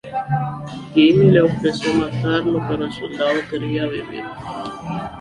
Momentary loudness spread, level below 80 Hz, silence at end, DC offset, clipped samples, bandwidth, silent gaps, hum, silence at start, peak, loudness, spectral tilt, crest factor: 16 LU; -48 dBFS; 0 s; under 0.1%; under 0.1%; 11 kHz; none; none; 0.05 s; -2 dBFS; -19 LUFS; -7 dB/octave; 16 dB